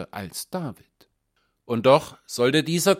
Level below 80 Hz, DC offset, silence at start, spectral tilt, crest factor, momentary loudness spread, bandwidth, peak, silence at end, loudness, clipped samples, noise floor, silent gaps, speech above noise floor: -62 dBFS; under 0.1%; 0 s; -4.5 dB/octave; 20 dB; 15 LU; 16.5 kHz; -4 dBFS; 0 s; -23 LUFS; under 0.1%; -72 dBFS; none; 49 dB